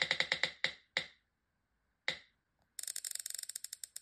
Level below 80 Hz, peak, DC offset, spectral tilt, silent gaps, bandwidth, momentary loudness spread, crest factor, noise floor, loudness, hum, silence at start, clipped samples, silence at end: -78 dBFS; -14 dBFS; under 0.1%; 0.5 dB/octave; none; 15.5 kHz; 13 LU; 28 dB; -83 dBFS; -38 LUFS; none; 0 s; under 0.1%; 0 s